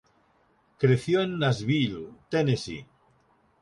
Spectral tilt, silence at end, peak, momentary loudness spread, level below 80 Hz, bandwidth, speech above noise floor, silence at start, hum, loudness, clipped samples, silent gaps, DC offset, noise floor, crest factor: -6.5 dB/octave; 0.75 s; -10 dBFS; 13 LU; -60 dBFS; 11.5 kHz; 40 dB; 0.8 s; none; -26 LUFS; under 0.1%; none; under 0.1%; -65 dBFS; 18 dB